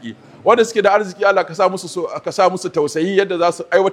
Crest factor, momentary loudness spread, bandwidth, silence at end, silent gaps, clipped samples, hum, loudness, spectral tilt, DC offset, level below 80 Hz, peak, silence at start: 16 dB; 9 LU; 14.5 kHz; 0 s; none; under 0.1%; none; -17 LUFS; -4.5 dB/octave; under 0.1%; -64 dBFS; 0 dBFS; 0 s